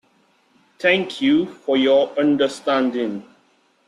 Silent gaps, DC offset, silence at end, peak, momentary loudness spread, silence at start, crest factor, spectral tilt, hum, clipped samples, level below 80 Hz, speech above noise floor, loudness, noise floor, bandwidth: none; under 0.1%; 0.65 s; -4 dBFS; 7 LU; 0.8 s; 18 dB; -5 dB/octave; none; under 0.1%; -64 dBFS; 42 dB; -19 LUFS; -60 dBFS; 11 kHz